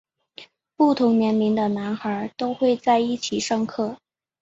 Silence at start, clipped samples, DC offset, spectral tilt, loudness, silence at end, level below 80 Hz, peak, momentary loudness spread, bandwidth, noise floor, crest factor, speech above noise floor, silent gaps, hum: 0.4 s; under 0.1%; under 0.1%; -5 dB/octave; -22 LUFS; 0.45 s; -64 dBFS; -6 dBFS; 9 LU; 8 kHz; -48 dBFS; 16 dB; 26 dB; none; none